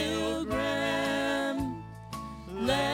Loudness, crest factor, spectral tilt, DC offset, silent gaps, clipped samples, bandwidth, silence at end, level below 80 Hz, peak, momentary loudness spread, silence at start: -31 LUFS; 16 dB; -4.5 dB/octave; under 0.1%; none; under 0.1%; 16.5 kHz; 0 s; -50 dBFS; -16 dBFS; 12 LU; 0 s